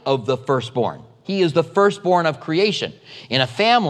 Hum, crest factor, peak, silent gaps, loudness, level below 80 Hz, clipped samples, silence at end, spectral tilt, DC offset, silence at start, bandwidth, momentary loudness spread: none; 18 dB; -2 dBFS; none; -20 LUFS; -66 dBFS; under 0.1%; 0 s; -5.5 dB/octave; under 0.1%; 0.05 s; 10 kHz; 9 LU